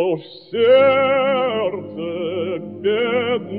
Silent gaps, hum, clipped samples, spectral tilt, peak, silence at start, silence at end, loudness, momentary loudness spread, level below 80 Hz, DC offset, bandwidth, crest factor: none; none; under 0.1%; -9.5 dB/octave; -4 dBFS; 0 s; 0 s; -18 LUFS; 14 LU; -66 dBFS; 0.1%; 4.8 kHz; 14 dB